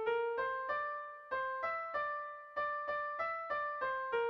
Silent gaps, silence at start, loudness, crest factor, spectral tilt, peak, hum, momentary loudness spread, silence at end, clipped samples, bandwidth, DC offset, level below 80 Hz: none; 0 s; -38 LUFS; 14 dB; -4.5 dB/octave; -24 dBFS; none; 5 LU; 0 s; under 0.1%; 6.2 kHz; under 0.1%; -74 dBFS